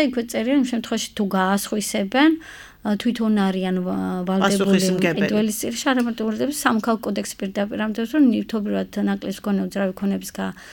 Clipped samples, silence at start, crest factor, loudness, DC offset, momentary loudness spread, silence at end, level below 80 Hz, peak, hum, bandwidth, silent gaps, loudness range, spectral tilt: under 0.1%; 0 s; 20 dB; -22 LUFS; under 0.1%; 8 LU; 0 s; -54 dBFS; -2 dBFS; none; 19 kHz; none; 2 LU; -5 dB/octave